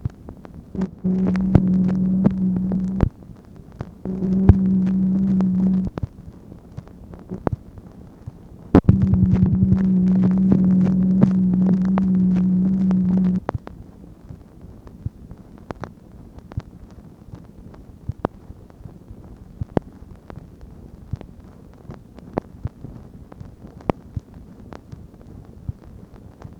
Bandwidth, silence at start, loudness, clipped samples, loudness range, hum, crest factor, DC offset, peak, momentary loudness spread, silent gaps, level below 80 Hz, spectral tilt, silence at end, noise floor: 3.3 kHz; 0.05 s; -19 LUFS; under 0.1%; 19 LU; none; 22 dB; under 0.1%; 0 dBFS; 25 LU; none; -36 dBFS; -11 dB/octave; 0.05 s; -43 dBFS